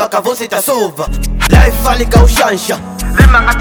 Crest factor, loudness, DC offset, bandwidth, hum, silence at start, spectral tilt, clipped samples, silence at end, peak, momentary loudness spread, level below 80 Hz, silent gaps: 10 dB; -11 LUFS; under 0.1%; over 20 kHz; none; 0 s; -5 dB/octave; 1%; 0 s; 0 dBFS; 10 LU; -12 dBFS; none